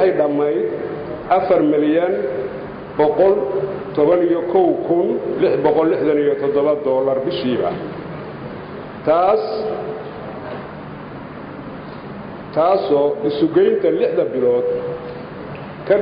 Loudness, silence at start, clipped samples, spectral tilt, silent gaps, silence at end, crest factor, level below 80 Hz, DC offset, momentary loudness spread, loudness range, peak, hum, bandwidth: -18 LUFS; 0 s; under 0.1%; -11.5 dB/octave; none; 0 s; 14 dB; -52 dBFS; under 0.1%; 17 LU; 6 LU; -4 dBFS; none; 5.4 kHz